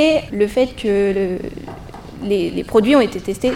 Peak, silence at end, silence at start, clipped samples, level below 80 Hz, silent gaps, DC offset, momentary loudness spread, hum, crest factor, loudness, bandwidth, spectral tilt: 0 dBFS; 0 s; 0 s; under 0.1%; -40 dBFS; none; under 0.1%; 19 LU; none; 18 dB; -17 LUFS; 16 kHz; -6 dB/octave